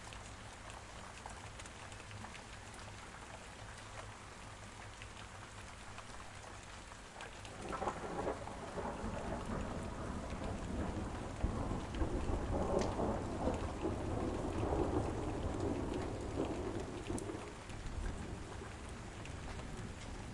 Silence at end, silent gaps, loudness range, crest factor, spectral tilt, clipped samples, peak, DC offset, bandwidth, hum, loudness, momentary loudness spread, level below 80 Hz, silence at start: 0 s; none; 12 LU; 20 dB; -6 dB/octave; under 0.1%; -22 dBFS; under 0.1%; 11.5 kHz; none; -43 LUFS; 12 LU; -50 dBFS; 0 s